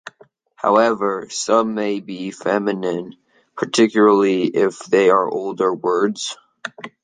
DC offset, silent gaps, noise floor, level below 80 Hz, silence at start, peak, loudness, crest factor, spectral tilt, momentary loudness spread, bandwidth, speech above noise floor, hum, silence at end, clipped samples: under 0.1%; none; -52 dBFS; -68 dBFS; 0.05 s; -2 dBFS; -18 LUFS; 16 dB; -4.5 dB/octave; 15 LU; 9.6 kHz; 34 dB; none; 0.15 s; under 0.1%